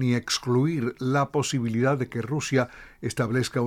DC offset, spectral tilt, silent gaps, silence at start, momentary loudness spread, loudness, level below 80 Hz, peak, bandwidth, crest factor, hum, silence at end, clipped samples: under 0.1%; -5.5 dB/octave; none; 0 s; 5 LU; -26 LUFS; -56 dBFS; -8 dBFS; 15 kHz; 16 dB; none; 0 s; under 0.1%